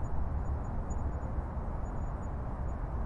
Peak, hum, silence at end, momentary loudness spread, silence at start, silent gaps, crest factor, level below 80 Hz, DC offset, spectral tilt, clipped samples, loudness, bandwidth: -22 dBFS; none; 0 s; 2 LU; 0 s; none; 12 dB; -36 dBFS; under 0.1%; -9 dB/octave; under 0.1%; -38 LUFS; 7.4 kHz